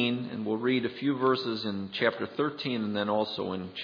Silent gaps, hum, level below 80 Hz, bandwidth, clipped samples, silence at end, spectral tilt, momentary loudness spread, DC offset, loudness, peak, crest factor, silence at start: none; none; -74 dBFS; 5.4 kHz; under 0.1%; 0 s; -7.5 dB/octave; 6 LU; under 0.1%; -30 LUFS; -10 dBFS; 20 dB; 0 s